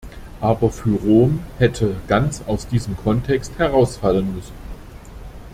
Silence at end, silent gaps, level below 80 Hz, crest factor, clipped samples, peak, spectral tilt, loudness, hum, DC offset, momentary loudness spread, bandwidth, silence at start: 0 s; none; -36 dBFS; 18 dB; under 0.1%; -2 dBFS; -7 dB/octave; -19 LUFS; none; under 0.1%; 23 LU; 15.5 kHz; 0.05 s